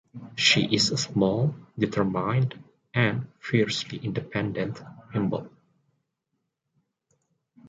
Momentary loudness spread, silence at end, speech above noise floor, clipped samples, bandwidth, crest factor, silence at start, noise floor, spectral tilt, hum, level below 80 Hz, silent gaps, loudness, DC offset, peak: 13 LU; 2.2 s; 54 dB; under 0.1%; 9.4 kHz; 22 dB; 0.15 s; -80 dBFS; -4.5 dB/octave; none; -60 dBFS; none; -26 LUFS; under 0.1%; -6 dBFS